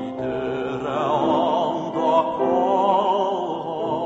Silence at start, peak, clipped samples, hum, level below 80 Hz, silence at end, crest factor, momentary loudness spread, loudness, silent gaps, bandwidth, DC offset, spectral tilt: 0 s; -6 dBFS; under 0.1%; none; -56 dBFS; 0 s; 14 dB; 7 LU; -22 LUFS; none; 7.8 kHz; under 0.1%; -6.5 dB/octave